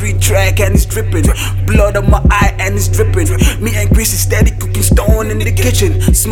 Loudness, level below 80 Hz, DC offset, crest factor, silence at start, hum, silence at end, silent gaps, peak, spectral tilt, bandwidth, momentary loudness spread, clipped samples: -12 LUFS; -14 dBFS; under 0.1%; 10 dB; 0 s; none; 0 s; none; 0 dBFS; -5 dB/octave; 18.5 kHz; 3 LU; under 0.1%